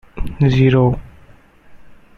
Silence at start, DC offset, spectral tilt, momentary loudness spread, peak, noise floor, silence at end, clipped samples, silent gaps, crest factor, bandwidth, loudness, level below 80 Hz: 0.15 s; under 0.1%; -9 dB/octave; 15 LU; -2 dBFS; -45 dBFS; 0.25 s; under 0.1%; none; 16 dB; 6.4 kHz; -15 LUFS; -32 dBFS